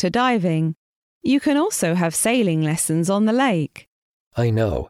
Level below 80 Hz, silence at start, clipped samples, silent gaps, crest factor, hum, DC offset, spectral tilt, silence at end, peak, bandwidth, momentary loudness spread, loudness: -46 dBFS; 0 s; under 0.1%; 0.77-1.21 s, 3.88-4.31 s; 14 dB; none; under 0.1%; -5 dB/octave; 0 s; -6 dBFS; 15.5 kHz; 8 LU; -20 LUFS